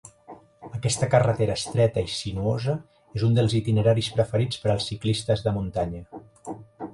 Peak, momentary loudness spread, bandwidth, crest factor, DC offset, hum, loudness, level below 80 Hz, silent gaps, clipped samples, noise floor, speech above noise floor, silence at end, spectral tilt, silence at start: -6 dBFS; 18 LU; 11.5 kHz; 18 dB; under 0.1%; none; -24 LUFS; -48 dBFS; none; under 0.1%; -48 dBFS; 25 dB; 0 s; -6 dB/octave; 0.05 s